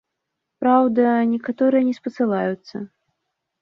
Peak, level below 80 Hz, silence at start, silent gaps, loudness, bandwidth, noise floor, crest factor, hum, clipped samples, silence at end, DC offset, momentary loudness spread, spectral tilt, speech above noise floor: -4 dBFS; -68 dBFS; 0.6 s; none; -19 LUFS; 6.2 kHz; -80 dBFS; 16 dB; none; under 0.1%; 0.75 s; under 0.1%; 16 LU; -8.5 dB/octave; 61 dB